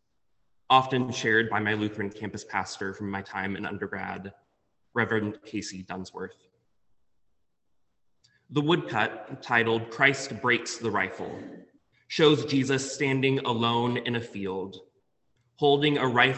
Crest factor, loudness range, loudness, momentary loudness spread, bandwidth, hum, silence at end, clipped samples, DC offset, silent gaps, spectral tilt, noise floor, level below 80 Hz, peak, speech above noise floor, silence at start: 24 dB; 8 LU; -27 LUFS; 15 LU; 8.6 kHz; none; 0 s; under 0.1%; under 0.1%; none; -4.5 dB/octave; -78 dBFS; -64 dBFS; -4 dBFS; 51 dB; 0.7 s